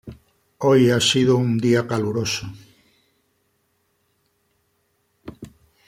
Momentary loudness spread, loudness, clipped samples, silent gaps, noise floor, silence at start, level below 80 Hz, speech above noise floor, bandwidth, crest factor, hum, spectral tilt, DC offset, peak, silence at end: 24 LU; -19 LUFS; under 0.1%; none; -68 dBFS; 0.05 s; -56 dBFS; 50 dB; 16 kHz; 18 dB; none; -5 dB/octave; under 0.1%; -6 dBFS; 0.4 s